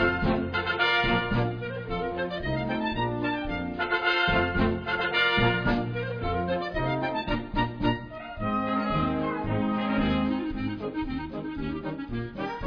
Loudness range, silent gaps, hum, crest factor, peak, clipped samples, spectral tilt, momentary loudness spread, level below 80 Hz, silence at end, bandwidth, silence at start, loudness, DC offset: 4 LU; none; none; 16 dB; -10 dBFS; under 0.1%; -7.5 dB/octave; 10 LU; -40 dBFS; 0 s; 5.4 kHz; 0 s; -27 LUFS; under 0.1%